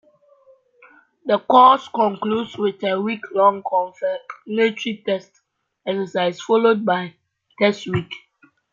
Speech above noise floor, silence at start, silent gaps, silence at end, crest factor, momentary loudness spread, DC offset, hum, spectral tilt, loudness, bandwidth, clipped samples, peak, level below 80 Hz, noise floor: 35 dB; 1.25 s; none; 0.55 s; 18 dB; 13 LU; under 0.1%; none; -6 dB/octave; -19 LUFS; 7.6 kHz; under 0.1%; -2 dBFS; -66 dBFS; -54 dBFS